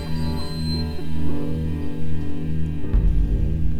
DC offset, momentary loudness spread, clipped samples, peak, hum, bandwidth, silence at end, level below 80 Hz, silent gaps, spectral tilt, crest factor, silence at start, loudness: under 0.1%; 6 LU; under 0.1%; -8 dBFS; none; 13 kHz; 0 s; -26 dBFS; none; -7.5 dB/octave; 10 dB; 0 s; -26 LUFS